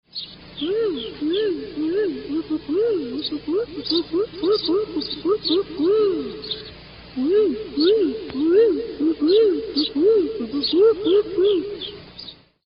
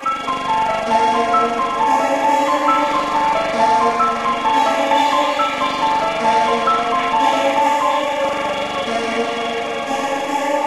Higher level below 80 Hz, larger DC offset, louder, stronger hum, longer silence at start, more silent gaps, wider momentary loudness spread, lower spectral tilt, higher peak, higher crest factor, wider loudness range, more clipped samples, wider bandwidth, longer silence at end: about the same, -54 dBFS vs -52 dBFS; neither; second, -21 LUFS vs -17 LUFS; first, 60 Hz at -50 dBFS vs none; first, 0.15 s vs 0 s; neither; first, 13 LU vs 5 LU; first, -9 dB/octave vs -3 dB/octave; second, -8 dBFS vs -4 dBFS; about the same, 14 dB vs 14 dB; first, 5 LU vs 2 LU; neither; second, 5.4 kHz vs 13.5 kHz; first, 0.35 s vs 0 s